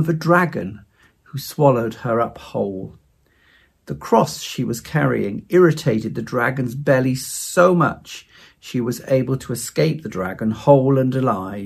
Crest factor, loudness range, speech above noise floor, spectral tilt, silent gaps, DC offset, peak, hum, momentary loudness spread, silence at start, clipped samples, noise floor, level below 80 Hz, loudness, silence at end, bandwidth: 20 dB; 5 LU; 39 dB; -6 dB/octave; none; under 0.1%; 0 dBFS; none; 14 LU; 0 s; under 0.1%; -58 dBFS; -54 dBFS; -19 LUFS; 0 s; 15.5 kHz